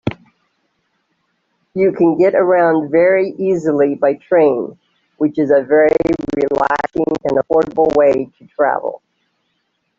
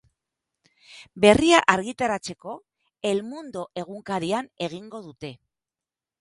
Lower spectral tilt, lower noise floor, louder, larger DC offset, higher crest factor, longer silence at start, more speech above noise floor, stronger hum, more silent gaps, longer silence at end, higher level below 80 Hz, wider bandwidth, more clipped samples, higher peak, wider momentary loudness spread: first, -8 dB/octave vs -4 dB/octave; second, -68 dBFS vs under -90 dBFS; first, -15 LUFS vs -23 LUFS; neither; second, 14 dB vs 26 dB; second, 0.05 s vs 0.9 s; second, 54 dB vs over 66 dB; neither; neither; first, 1 s vs 0.85 s; about the same, -50 dBFS vs -54 dBFS; second, 7.4 kHz vs 11.5 kHz; neither; about the same, -2 dBFS vs 0 dBFS; second, 8 LU vs 22 LU